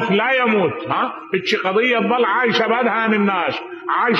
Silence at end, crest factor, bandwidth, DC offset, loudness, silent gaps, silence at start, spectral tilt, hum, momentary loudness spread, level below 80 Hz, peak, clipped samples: 0 s; 14 dB; 7.4 kHz; under 0.1%; -18 LUFS; none; 0 s; -5.5 dB/octave; none; 6 LU; -68 dBFS; -4 dBFS; under 0.1%